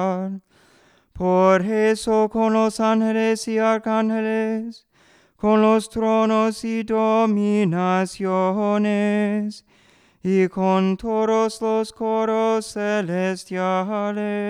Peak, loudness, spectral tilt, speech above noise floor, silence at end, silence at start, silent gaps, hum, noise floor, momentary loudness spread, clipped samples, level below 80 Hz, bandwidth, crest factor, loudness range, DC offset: -4 dBFS; -21 LUFS; -6.5 dB/octave; 37 dB; 0 s; 0 s; none; none; -56 dBFS; 7 LU; under 0.1%; -56 dBFS; 12 kHz; 18 dB; 2 LU; under 0.1%